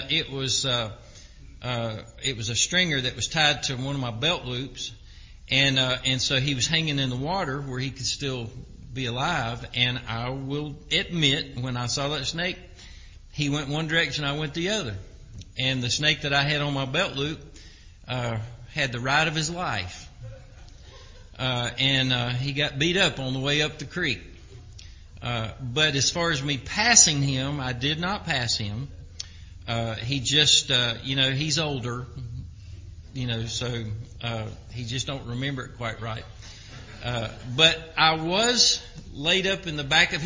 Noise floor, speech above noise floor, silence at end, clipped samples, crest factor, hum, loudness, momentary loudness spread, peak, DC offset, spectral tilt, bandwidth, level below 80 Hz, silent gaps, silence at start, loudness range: -47 dBFS; 21 dB; 0 s; under 0.1%; 26 dB; none; -24 LUFS; 17 LU; 0 dBFS; under 0.1%; -3 dB/octave; 7.8 kHz; -46 dBFS; none; 0 s; 7 LU